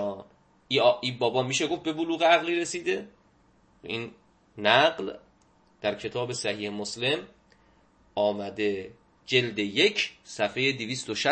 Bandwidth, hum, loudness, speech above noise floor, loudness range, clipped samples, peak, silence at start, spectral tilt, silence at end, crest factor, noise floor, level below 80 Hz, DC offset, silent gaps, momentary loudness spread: 8.8 kHz; none; -27 LUFS; 36 dB; 5 LU; under 0.1%; -4 dBFS; 0 s; -3.5 dB/octave; 0 s; 24 dB; -63 dBFS; -68 dBFS; under 0.1%; none; 14 LU